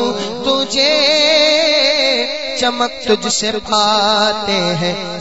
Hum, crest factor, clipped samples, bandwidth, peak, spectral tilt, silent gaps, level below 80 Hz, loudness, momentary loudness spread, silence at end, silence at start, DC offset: none; 14 dB; under 0.1%; 8 kHz; 0 dBFS; -2.5 dB/octave; none; -50 dBFS; -13 LUFS; 8 LU; 0 s; 0 s; 1%